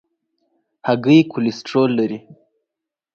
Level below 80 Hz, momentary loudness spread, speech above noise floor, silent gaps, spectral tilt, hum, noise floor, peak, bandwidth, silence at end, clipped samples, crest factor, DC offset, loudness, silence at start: -66 dBFS; 12 LU; 67 dB; none; -7 dB/octave; none; -84 dBFS; -2 dBFS; 7 kHz; 0.8 s; under 0.1%; 18 dB; under 0.1%; -17 LUFS; 0.85 s